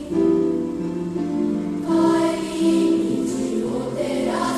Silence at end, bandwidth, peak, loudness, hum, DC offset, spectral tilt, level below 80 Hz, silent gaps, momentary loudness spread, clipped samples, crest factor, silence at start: 0 s; 12.5 kHz; -8 dBFS; -21 LUFS; none; under 0.1%; -6 dB/octave; -50 dBFS; none; 7 LU; under 0.1%; 12 dB; 0 s